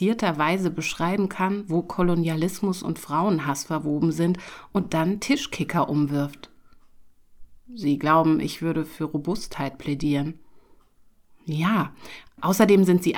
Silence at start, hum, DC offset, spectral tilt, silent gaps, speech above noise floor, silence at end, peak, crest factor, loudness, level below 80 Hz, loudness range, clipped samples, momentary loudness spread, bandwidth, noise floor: 0 s; none; under 0.1%; -6 dB/octave; none; 32 dB; 0 s; -2 dBFS; 22 dB; -24 LUFS; -52 dBFS; 4 LU; under 0.1%; 11 LU; 19.5 kHz; -56 dBFS